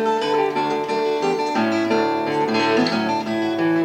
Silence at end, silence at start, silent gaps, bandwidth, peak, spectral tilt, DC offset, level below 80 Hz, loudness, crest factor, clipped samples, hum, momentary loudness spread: 0 s; 0 s; none; 15.5 kHz; -6 dBFS; -5 dB/octave; under 0.1%; -68 dBFS; -20 LUFS; 12 dB; under 0.1%; none; 4 LU